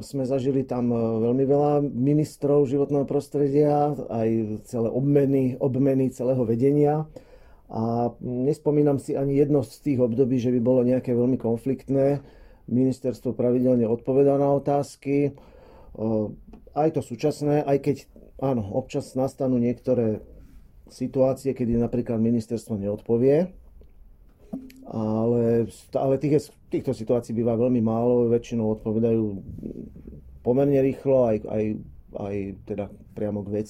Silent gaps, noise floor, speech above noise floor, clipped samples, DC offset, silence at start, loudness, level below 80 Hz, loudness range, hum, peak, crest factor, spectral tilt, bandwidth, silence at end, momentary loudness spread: none; -50 dBFS; 27 dB; under 0.1%; under 0.1%; 0 s; -24 LUFS; -50 dBFS; 4 LU; none; -8 dBFS; 16 dB; -9 dB/octave; 15 kHz; 0 s; 11 LU